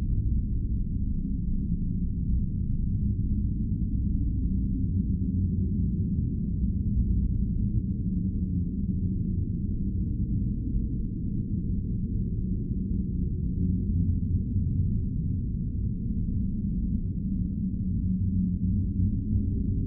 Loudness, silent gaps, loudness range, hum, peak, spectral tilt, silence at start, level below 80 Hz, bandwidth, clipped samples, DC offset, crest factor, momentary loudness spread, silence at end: -29 LUFS; none; 2 LU; none; -14 dBFS; -15.5 dB/octave; 0 s; -30 dBFS; 0.6 kHz; under 0.1%; under 0.1%; 12 dB; 3 LU; 0 s